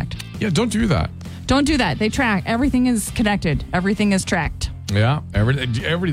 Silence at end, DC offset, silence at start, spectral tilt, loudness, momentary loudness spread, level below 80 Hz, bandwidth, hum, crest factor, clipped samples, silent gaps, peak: 0 s; under 0.1%; 0 s; -5.5 dB/octave; -20 LUFS; 6 LU; -32 dBFS; 15.5 kHz; none; 14 dB; under 0.1%; none; -6 dBFS